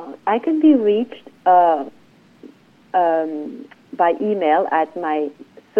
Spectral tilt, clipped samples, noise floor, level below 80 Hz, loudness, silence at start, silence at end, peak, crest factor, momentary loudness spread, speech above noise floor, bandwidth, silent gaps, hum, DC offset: -7.5 dB/octave; under 0.1%; -46 dBFS; -74 dBFS; -18 LUFS; 0 s; 0 s; -4 dBFS; 16 dB; 16 LU; 29 dB; 4.6 kHz; none; none; under 0.1%